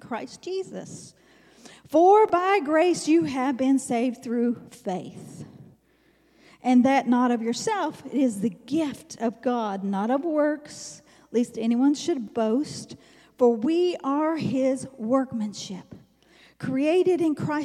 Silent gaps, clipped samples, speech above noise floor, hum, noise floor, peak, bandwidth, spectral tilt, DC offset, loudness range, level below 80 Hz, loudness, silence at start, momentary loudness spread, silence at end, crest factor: none; under 0.1%; 39 dB; none; -63 dBFS; -8 dBFS; 13 kHz; -5.5 dB/octave; under 0.1%; 5 LU; -70 dBFS; -24 LUFS; 0.05 s; 16 LU; 0 s; 18 dB